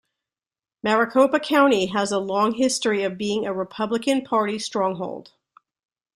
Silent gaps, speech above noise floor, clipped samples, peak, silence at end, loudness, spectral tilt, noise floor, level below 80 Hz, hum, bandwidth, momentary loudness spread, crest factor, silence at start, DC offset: none; over 68 dB; under 0.1%; -4 dBFS; 0.95 s; -22 LUFS; -4 dB/octave; under -90 dBFS; -66 dBFS; none; 15 kHz; 9 LU; 18 dB; 0.85 s; under 0.1%